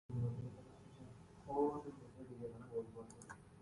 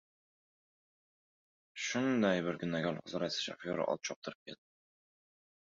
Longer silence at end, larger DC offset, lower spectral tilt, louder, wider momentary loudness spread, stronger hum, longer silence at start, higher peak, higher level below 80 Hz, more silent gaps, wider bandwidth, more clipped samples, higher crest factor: second, 0 s vs 1.1 s; neither; first, -8.5 dB/octave vs -4 dB/octave; second, -46 LUFS vs -36 LUFS; about the same, 19 LU vs 20 LU; neither; second, 0.1 s vs 1.75 s; second, -26 dBFS vs -18 dBFS; first, -68 dBFS vs -74 dBFS; second, none vs 4.16-4.22 s, 4.35-4.46 s; first, 11.5 kHz vs 7.6 kHz; neither; about the same, 20 dB vs 22 dB